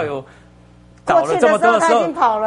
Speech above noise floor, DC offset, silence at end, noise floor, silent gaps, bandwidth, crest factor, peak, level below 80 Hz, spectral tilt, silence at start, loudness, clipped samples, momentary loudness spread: 30 dB; under 0.1%; 0 s; -46 dBFS; none; 11 kHz; 14 dB; -2 dBFS; -52 dBFS; -4.5 dB/octave; 0 s; -15 LUFS; under 0.1%; 14 LU